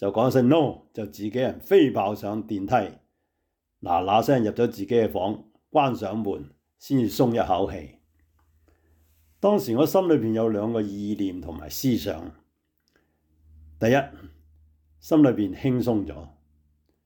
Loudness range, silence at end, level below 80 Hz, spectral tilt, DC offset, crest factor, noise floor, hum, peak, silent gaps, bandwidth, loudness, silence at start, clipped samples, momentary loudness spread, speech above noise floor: 5 LU; 0.75 s; -56 dBFS; -7 dB/octave; under 0.1%; 16 dB; -78 dBFS; none; -8 dBFS; none; 19.5 kHz; -24 LUFS; 0 s; under 0.1%; 16 LU; 55 dB